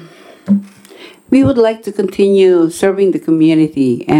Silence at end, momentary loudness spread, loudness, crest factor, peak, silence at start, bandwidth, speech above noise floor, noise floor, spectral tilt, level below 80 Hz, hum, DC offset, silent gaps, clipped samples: 0 s; 7 LU; -12 LUFS; 12 dB; 0 dBFS; 0 s; 13.5 kHz; 27 dB; -38 dBFS; -7 dB/octave; -48 dBFS; none; under 0.1%; none; under 0.1%